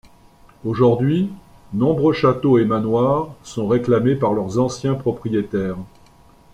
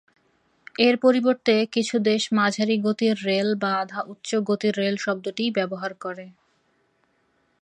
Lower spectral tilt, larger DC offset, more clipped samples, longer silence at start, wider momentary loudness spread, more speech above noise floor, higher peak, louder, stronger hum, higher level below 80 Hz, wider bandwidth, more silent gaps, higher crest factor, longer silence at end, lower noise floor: first, -8 dB/octave vs -5 dB/octave; neither; neither; second, 0.65 s vs 0.8 s; about the same, 11 LU vs 12 LU; second, 31 dB vs 45 dB; about the same, -4 dBFS vs -4 dBFS; first, -19 LUFS vs -23 LUFS; neither; first, -50 dBFS vs -74 dBFS; about the same, 10.5 kHz vs 9.8 kHz; neither; about the same, 16 dB vs 20 dB; second, 0.65 s vs 1.3 s; second, -49 dBFS vs -67 dBFS